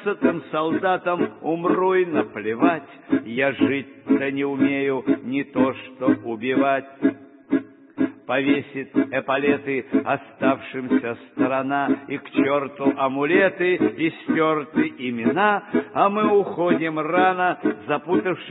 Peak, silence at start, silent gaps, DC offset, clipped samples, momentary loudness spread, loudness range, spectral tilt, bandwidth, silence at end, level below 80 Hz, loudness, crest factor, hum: -4 dBFS; 0 s; none; under 0.1%; under 0.1%; 6 LU; 3 LU; -11 dB/octave; 4 kHz; 0 s; -68 dBFS; -22 LUFS; 18 dB; none